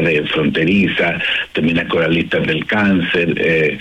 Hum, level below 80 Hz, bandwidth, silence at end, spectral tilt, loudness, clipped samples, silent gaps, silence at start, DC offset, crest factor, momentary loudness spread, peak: none; -46 dBFS; 11 kHz; 0 s; -7 dB/octave; -15 LUFS; under 0.1%; none; 0 s; under 0.1%; 10 dB; 3 LU; -6 dBFS